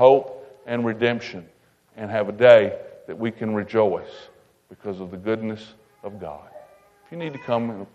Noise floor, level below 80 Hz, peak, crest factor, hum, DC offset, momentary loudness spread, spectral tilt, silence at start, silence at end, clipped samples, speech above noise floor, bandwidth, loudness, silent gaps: -52 dBFS; -66 dBFS; 0 dBFS; 22 dB; none; under 0.1%; 23 LU; -7 dB/octave; 0 s; 0.1 s; under 0.1%; 30 dB; 7.8 kHz; -22 LUFS; none